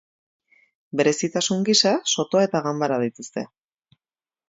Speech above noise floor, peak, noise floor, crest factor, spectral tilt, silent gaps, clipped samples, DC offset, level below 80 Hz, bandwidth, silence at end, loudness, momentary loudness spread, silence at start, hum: over 68 dB; -4 dBFS; under -90 dBFS; 20 dB; -3.5 dB/octave; none; under 0.1%; under 0.1%; -70 dBFS; 8 kHz; 1.05 s; -21 LUFS; 15 LU; 0.95 s; none